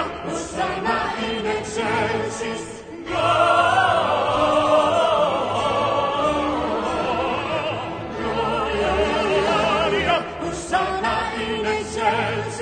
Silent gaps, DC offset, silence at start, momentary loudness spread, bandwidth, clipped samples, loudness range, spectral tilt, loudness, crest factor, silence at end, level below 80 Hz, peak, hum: none; under 0.1%; 0 s; 10 LU; 9.4 kHz; under 0.1%; 4 LU; -4.5 dB/octave; -21 LUFS; 16 dB; 0 s; -42 dBFS; -6 dBFS; none